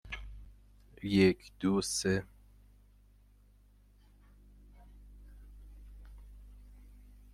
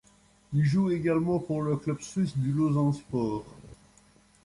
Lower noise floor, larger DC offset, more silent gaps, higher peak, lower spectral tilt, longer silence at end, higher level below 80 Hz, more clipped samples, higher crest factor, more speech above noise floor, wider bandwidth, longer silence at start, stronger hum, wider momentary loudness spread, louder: about the same, -62 dBFS vs -61 dBFS; neither; neither; about the same, -14 dBFS vs -16 dBFS; second, -5 dB/octave vs -8 dB/octave; about the same, 0.75 s vs 0.7 s; about the same, -54 dBFS vs -58 dBFS; neither; first, 24 dB vs 12 dB; about the same, 32 dB vs 34 dB; first, 13.5 kHz vs 11.5 kHz; second, 0.05 s vs 0.5 s; first, 50 Hz at -55 dBFS vs none; first, 29 LU vs 7 LU; second, -32 LUFS vs -28 LUFS